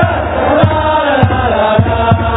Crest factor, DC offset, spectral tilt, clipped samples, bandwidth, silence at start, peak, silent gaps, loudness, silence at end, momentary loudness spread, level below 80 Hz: 10 dB; under 0.1%; -10.5 dB/octave; 0.1%; 4 kHz; 0 s; 0 dBFS; none; -11 LUFS; 0 s; 2 LU; -24 dBFS